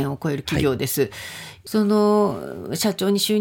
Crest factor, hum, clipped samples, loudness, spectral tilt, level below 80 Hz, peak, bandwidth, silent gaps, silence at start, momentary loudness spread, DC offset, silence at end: 14 dB; none; under 0.1%; -21 LUFS; -5 dB/octave; -50 dBFS; -8 dBFS; 17 kHz; none; 0 s; 13 LU; under 0.1%; 0 s